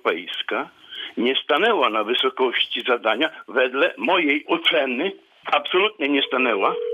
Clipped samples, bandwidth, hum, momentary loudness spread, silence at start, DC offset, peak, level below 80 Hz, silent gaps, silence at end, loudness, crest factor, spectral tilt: under 0.1%; 13.5 kHz; none; 8 LU; 0.05 s; under 0.1%; -6 dBFS; -76 dBFS; none; 0 s; -21 LUFS; 16 dB; -4.5 dB/octave